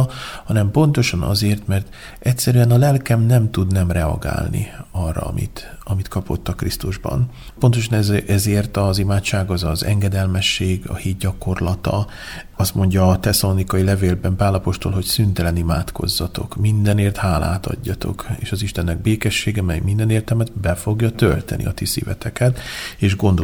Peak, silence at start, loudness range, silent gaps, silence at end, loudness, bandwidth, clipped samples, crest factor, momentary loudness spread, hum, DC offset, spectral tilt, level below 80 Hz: -2 dBFS; 0 s; 4 LU; none; 0 s; -19 LUFS; 19 kHz; under 0.1%; 16 dB; 9 LU; none; under 0.1%; -5.5 dB/octave; -32 dBFS